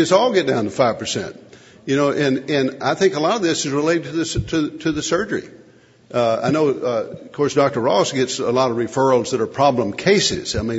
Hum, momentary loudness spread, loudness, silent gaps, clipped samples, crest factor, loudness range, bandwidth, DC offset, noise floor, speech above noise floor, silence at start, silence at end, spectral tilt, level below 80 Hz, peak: none; 6 LU; -19 LUFS; none; under 0.1%; 18 dB; 3 LU; 8 kHz; under 0.1%; -49 dBFS; 31 dB; 0 s; 0 s; -4.5 dB/octave; -46 dBFS; 0 dBFS